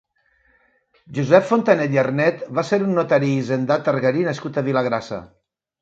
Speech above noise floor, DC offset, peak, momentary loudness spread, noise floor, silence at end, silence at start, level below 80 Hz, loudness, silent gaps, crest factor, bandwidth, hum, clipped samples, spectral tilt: 43 dB; under 0.1%; 0 dBFS; 9 LU; -62 dBFS; 0.55 s; 1.1 s; -62 dBFS; -19 LUFS; none; 20 dB; 7.8 kHz; none; under 0.1%; -7 dB/octave